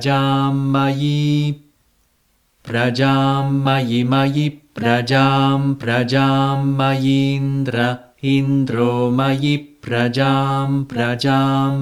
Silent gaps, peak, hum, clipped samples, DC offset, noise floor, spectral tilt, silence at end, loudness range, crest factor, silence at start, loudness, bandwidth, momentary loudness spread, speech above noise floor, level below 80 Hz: none; -4 dBFS; none; under 0.1%; under 0.1%; -62 dBFS; -7 dB/octave; 0 s; 2 LU; 14 dB; 0 s; -17 LUFS; 12.5 kHz; 5 LU; 45 dB; -56 dBFS